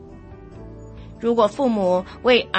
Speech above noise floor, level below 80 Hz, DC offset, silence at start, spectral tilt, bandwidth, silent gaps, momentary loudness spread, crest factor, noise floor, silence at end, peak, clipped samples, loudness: 22 dB; -46 dBFS; under 0.1%; 0 s; -5.5 dB/octave; 8.6 kHz; none; 23 LU; 18 dB; -40 dBFS; 0 s; -4 dBFS; under 0.1%; -20 LUFS